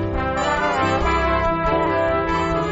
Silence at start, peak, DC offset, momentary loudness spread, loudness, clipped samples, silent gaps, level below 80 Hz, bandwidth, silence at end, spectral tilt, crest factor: 0 s; -6 dBFS; under 0.1%; 2 LU; -20 LUFS; under 0.1%; none; -30 dBFS; 8 kHz; 0 s; -4.5 dB/octave; 12 dB